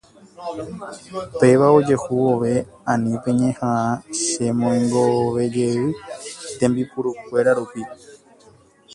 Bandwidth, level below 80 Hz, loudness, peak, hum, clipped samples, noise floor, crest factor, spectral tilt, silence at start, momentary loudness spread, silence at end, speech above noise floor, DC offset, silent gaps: 11.5 kHz; -56 dBFS; -19 LUFS; -2 dBFS; none; under 0.1%; -51 dBFS; 20 dB; -6 dB/octave; 0.4 s; 16 LU; 0.8 s; 32 dB; under 0.1%; none